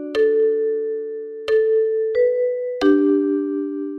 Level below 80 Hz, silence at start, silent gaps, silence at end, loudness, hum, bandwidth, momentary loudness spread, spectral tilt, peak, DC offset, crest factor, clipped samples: -60 dBFS; 0 s; none; 0 s; -19 LUFS; none; 6.4 kHz; 9 LU; -5.5 dB/octave; -4 dBFS; under 0.1%; 14 dB; under 0.1%